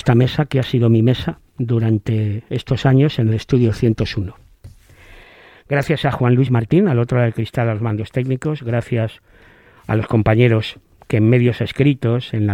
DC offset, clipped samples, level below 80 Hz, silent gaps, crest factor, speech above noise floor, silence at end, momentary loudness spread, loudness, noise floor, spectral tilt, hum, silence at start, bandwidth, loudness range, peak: under 0.1%; under 0.1%; -42 dBFS; none; 16 dB; 31 dB; 0 s; 8 LU; -17 LUFS; -47 dBFS; -8.5 dB/octave; none; 0.05 s; 9 kHz; 3 LU; 0 dBFS